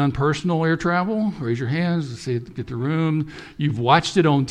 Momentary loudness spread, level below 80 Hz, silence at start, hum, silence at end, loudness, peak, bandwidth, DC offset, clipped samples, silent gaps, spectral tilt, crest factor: 10 LU; -48 dBFS; 0 s; none; 0 s; -22 LUFS; -2 dBFS; 10 kHz; under 0.1%; under 0.1%; none; -6.5 dB/octave; 20 dB